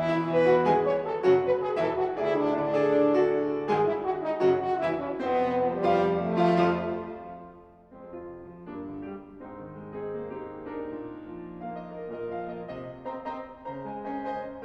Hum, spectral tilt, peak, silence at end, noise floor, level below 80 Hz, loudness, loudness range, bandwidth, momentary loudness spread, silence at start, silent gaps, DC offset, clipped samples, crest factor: none; -8 dB/octave; -12 dBFS; 0 s; -50 dBFS; -60 dBFS; -27 LUFS; 14 LU; 8 kHz; 18 LU; 0 s; none; under 0.1%; under 0.1%; 16 dB